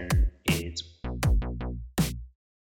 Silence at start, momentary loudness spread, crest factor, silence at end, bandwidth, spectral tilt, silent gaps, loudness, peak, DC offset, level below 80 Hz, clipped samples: 0 s; 9 LU; 16 dB; 0.4 s; 18.5 kHz; -5 dB/octave; none; -30 LUFS; -12 dBFS; under 0.1%; -32 dBFS; under 0.1%